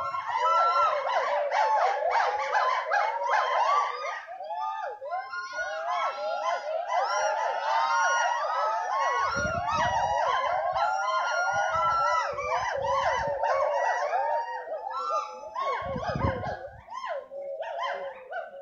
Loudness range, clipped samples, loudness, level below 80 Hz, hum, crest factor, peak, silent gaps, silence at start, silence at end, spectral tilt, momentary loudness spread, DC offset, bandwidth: 6 LU; under 0.1%; -27 LUFS; -56 dBFS; none; 16 dB; -12 dBFS; none; 0 s; 0 s; -3.5 dB/octave; 11 LU; under 0.1%; 7.6 kHz